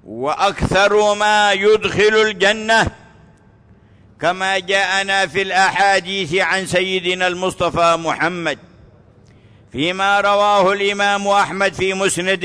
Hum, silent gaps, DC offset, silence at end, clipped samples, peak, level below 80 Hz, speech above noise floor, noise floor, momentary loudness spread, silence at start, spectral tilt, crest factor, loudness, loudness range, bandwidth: none; none; under 0.1%; 0 s; under 0.1%; -4 dBFS; -44 dBFS; 32 dB; -48 dBFS; 6 LU; 0.05 s; -3.5 dB/octave; 12 dB; -16 LUFS; 4 LU; 11 kHz